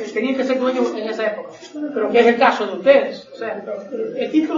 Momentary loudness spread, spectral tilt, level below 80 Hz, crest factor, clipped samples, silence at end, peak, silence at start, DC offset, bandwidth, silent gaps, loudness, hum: 14 LU; -5 dB/octave; -68 dBFS; 18 dB; under 0.1%; 0 s; 0 dBFS; 0 s; under 0.1%; 7.6 kHz; none; -19 LUFS; none